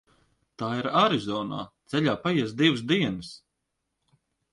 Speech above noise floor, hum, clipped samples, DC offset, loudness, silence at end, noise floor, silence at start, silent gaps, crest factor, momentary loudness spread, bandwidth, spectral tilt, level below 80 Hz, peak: 55 dB; none; under 0.1%; under 0.1%; -26 LUFS; 1.15 s; -81 dBFS; 0.6 s; none; 20 dB; 13 LU; 11.5 kHz; -6 dB/octave; -62 dBFS; -8 dBFS